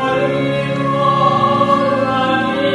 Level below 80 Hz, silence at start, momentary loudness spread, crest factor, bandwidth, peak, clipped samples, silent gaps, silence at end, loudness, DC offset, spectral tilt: -48 dBFS; 0 s; 4 LU; 14 dB; 11.5 kHz; -2 dBFS; under 0.1%; none; 0 s; -15 LUFS; under 0.1%; -6.5 dB/octave